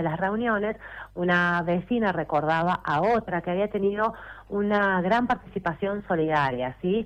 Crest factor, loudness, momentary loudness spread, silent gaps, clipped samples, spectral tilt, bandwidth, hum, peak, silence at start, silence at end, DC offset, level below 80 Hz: 12 dB; -25 LUFS; 7 LU; none; under 0.1%; -7.5 dB/octave; 8.6 kHz; none; -12 dBFS; 0 s; 0 s; under 0.1%; -52 dBFS